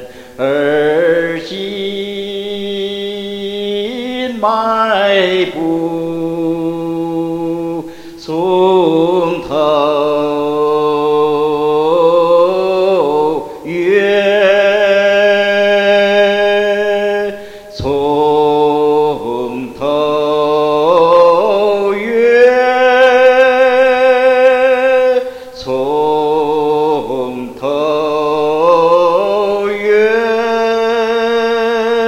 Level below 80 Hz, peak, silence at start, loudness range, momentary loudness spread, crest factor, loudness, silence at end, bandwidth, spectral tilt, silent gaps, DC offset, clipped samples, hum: -48 dBFS; 0 dBFS; 0 s; 7 LU; 11 LU; 12 dB; -12 LUFS; 0 s; 14 kHz; -5.5 dB/octave; none; under 0.1%; under 0.1%; none